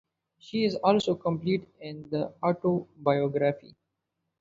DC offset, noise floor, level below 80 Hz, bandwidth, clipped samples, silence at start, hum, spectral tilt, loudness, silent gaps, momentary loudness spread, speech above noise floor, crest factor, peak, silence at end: under 0.1%; -82 dBFS; -68 dBFS; 7.8 kHz; under 0.1%; 0.45 s; none; -7 dB/octave; -28 LUFS; none; 10 LU; 55 dB; 20 dB; -8 dBFS; 0.75 s